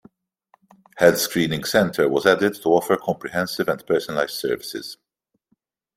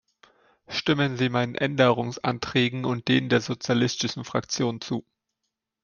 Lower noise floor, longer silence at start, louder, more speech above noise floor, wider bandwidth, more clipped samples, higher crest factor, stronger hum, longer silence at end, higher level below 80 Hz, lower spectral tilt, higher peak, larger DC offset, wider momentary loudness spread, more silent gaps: second, -69 dBFS vs -82 dBFS; first, 0.95 s vs 0.7 s; first, -21 LUFS vs -25 LUFS; second, 49 dB vs 58 dB; first, 16 kHz vs 7.2 kHz; neither; about the same, 20 dB vs 20 dB; neither; first, 1 s vs 0.8 s; about the same, -60 dBFS vs -62 dBFS; about the same, -4.5 dB/octave vs -5 dB/octave; first, -2 dBFS vs -6 dBFS; neither; about the same, 8 LU vs 8 LU; neither